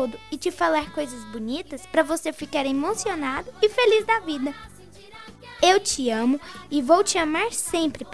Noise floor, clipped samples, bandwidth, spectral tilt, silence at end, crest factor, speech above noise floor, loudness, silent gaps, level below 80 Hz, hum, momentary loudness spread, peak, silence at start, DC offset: -45 dBFS; under 0.1%; 11 kHz; -2.5 dB/octave; 0 s; 18 dB; 22 dB; -23 LUFS; none; -54 dBFS; none; 13 LU; -6 dBFS; 0 s; 0.4%